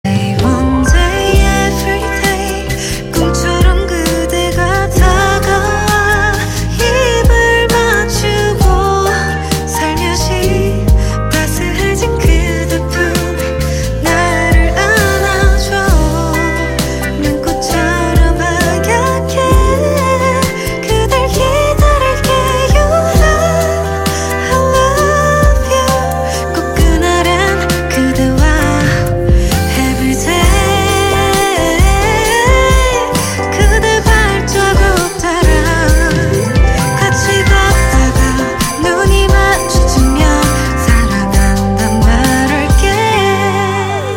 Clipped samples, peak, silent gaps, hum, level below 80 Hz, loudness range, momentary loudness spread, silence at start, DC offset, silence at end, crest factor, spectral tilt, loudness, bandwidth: under 0.1%; 0 dBFS; none; none; -16 dBFS; 2 LU; 5 LU; 0.05 s; under 0.1%; 0 s; 10 dB; -4.5 dB/octave; -11 LUFS; 17 kHz